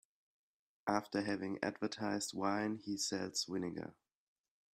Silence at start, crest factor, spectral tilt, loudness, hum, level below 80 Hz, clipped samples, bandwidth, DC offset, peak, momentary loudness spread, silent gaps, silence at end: 0.85 s; 22 dB; -3.5 dB/octave; -39 LUFS; none; -78 dBFS; under 0.1%; 15.5 kHz; under 0.1%; -18 dBFS; 6 LU; none; 0.8 s